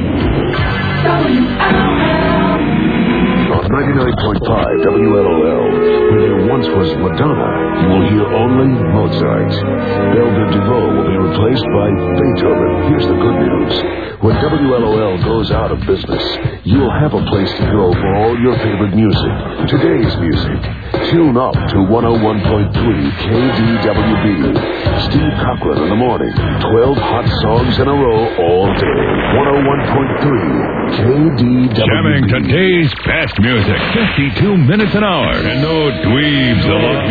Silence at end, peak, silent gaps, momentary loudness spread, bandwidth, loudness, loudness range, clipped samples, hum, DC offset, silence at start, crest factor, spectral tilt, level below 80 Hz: 0 s; 0 dBFS; none; 4 LU; 4.9 kHz; -13 LUFS; 2 LU; under 0.1%; none; 0.5%; 0 s; 12 dB; -9.5 dB/octave; -28 dBFS